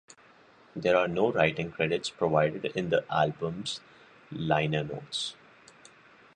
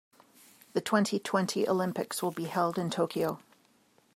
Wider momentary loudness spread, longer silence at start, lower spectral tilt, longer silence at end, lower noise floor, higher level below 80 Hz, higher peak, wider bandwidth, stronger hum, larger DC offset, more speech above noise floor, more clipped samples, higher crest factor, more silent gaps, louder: first, 11 LU vs 6 LU; about the same, 0.75 s vs 0.75 s; about the same, -5.5 dB/octave vs -5 dB/octave; first, 1.05 s vs 0.75 s; second, -58 dBFS vs -66 dBFS; first, -62 dBFS vs -76 dBFS; about the same, -10 dBFS vs -12 dBFS; second, 9.8 kHz vs 16 kHz; neither; neither; second, 29 dB vs 36 dB; neither; about the same, 20 dB vs 20 dB; neither; about the same, -29 LUFS vs -31 LUFS